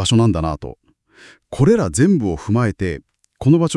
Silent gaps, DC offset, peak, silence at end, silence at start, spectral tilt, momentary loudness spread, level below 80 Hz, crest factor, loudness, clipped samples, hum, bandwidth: none; under 0.1%; -2 dBFS; 0 s; 0 s; -6 dB/octave; 16 LU; -40 dBFS; 16 dB; -17 LUFS; under 0.1%; none; 12 kHz